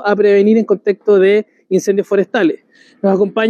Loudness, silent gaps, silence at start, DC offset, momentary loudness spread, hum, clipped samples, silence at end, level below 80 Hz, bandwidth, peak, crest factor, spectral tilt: -13 LUFS; none; 0 s; under 0.1%; 7 LU; none; under 0.1%; 0 s; -68 dBFS; 9 kHz; -2 dBFS; 10 dB; -6.5 dB/octave